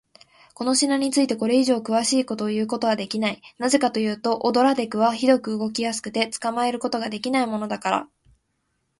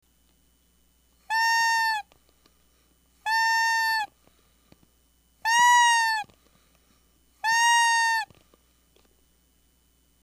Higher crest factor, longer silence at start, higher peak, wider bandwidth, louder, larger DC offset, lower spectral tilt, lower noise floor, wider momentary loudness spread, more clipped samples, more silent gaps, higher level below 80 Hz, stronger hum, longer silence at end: about the same, 20 dB vs 18 dB; second, 0.6 s vs 1.3 s; first, -4 dBFS vs -10 dBFS; second, 11.5 kHz vs 15.5 kHz; about the same, -23 LUFS vs -22 LUFS; neither; first, -3.5 dB/octave vs 3.5 dB/octave; first, -73 dBFS vs -65 dBFS; second, 7 LU vs 14 LU; neither; neither; about the same, -66 dBFS vs -68 dBFS; neither; second, 0.95 s vs 2 s